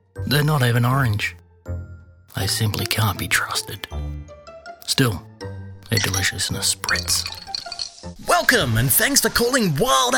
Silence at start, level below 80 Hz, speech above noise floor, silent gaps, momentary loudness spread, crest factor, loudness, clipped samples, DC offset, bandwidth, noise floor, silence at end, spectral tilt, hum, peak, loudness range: 0.15 s; -40 dBFS; 22 dB; none; 18 LU; 20 dB; -20 LUFS; under 0.1%; under 0.1%; 19.5 kHz; -42 dBFS; 0 s; -3.5 dB/octave; none; -2 dBFS; 5 LU